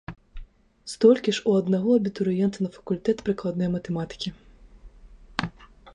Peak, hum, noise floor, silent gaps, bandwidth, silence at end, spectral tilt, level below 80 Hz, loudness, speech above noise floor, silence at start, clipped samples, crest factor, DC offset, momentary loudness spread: -6 dBFS; none; -49 dBFS; none; 11 kHz; 0.05 s; -6.5 dB/octave; -50 dBFS; -25 LUFS; 25 dB; 0.1 s; under 0.1%; 20 dB; under 0.1%; 15 LU